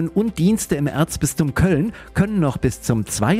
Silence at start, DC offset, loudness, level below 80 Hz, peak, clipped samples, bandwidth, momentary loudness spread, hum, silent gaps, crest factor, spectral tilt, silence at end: 0 s; under 0.1%; -20 LUFS; -38 dBFS; -6 dBFS; under 0.1%; 16 kHz; 4 LU; none; none; 14 dB; -6 dB/octave; 0 s